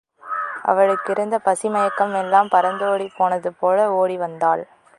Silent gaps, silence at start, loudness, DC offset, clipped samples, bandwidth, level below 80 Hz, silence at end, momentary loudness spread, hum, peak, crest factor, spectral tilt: none; 0.25 s; -20 LUFS; under 0.1%; under 0.1%; 11.5 kHz; -74 dBFS; 0.35 s; 6 LU; none; -2 dBFS; 18 dB; -5 dB/octave